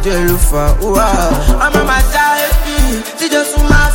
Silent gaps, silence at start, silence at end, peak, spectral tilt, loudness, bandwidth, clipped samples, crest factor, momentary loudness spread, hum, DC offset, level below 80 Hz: none; 0 s; 0 s; 0 dBFS; -4.5 dB/octave; -12 LUFS; 17 kHz; under 0.1%; 10 dB; 4 LU; none; under 0.1%; -14 dBFS